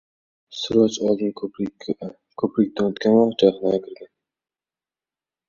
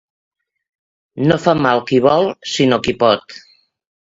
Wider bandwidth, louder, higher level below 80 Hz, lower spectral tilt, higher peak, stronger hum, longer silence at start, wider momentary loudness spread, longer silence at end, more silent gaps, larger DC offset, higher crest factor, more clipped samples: about the same, 7.4 kHz vs 7.8 kHz; second, -21 LUFS vs -15 LUFS; second, -62 dBFS vs -50 dBFS; about the same, -6 dB/octave vs -5.5 dB/octave; about the same, -2 dBFS vs 0 dBFS; neither; second, 0.5 s vs 1.15 s; first, 13 LU vs 6 LU; first, 1.45 s vs 0.75 s; neither; neither; about the same, 20 dB vs 18 dB; neither